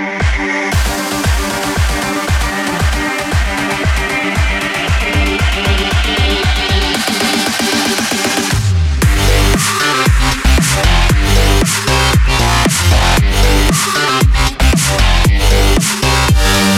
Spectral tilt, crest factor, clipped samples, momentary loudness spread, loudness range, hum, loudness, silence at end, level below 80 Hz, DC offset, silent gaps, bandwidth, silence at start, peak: -4 dB/octave; 12 dB; under 0.1%; 4 LU; 4 LU; none; -12 LUFS; 0 s; -16 dBFS; under 0.1%; none; 16.5 kHz; 0 s; 0 dBFS